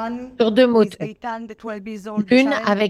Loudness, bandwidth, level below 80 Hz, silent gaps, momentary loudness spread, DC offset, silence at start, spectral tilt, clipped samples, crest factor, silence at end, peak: -18 LUFS; 12 kHz; -58 dBFS; none; 16 LU; under 0.1%; 0 s; -6 dB/octave; under 0.1%; 16 dB; 0 s; -2 dBFS